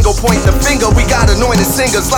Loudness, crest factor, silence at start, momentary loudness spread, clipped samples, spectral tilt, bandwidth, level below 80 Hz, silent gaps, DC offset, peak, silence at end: -11 LUFS; 10 dB; 0 s; 1 LU; under 0.1%; -4.5 dB/octave; over 20 kHz; -14 dBFS; none; under 0.1%; 0 dBFS; 0 s